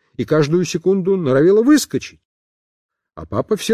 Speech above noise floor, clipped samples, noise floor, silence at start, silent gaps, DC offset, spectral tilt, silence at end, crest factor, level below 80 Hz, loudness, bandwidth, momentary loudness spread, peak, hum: over 74 dB; under 0.1%; under -90 dBFS; 0.2 s; 2.25-2.89 s; under 0.1%; -6 dB/octave; 0 s; 14 dB; -50 dBFS; -16 LUFS; 15.5 kHz; 12 LU; -4 dBFS; none